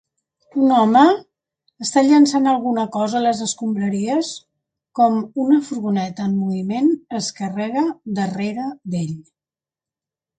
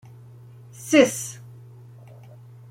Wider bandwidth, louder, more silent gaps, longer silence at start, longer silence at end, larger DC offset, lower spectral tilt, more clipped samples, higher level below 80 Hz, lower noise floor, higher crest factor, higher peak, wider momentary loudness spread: second, 9.4 kHz vs 16.5 kHz; about the same, -19 LUFS vs -20 LUFS; neither; second, 0.55 s vs 0.8 s; second, 1.15 s vs 1.35 s; neither; first, -5.5 dB/octave vs -4 dB/octave; neither; about the same, -64 dBFS vs -68 dBFS; first, under -90 dBFS vs -45 dBFS; second, 18 dB vs 24 dB; about the same, -2 dBFS vs -2 dBFS; second, 12 LU vs 27 LU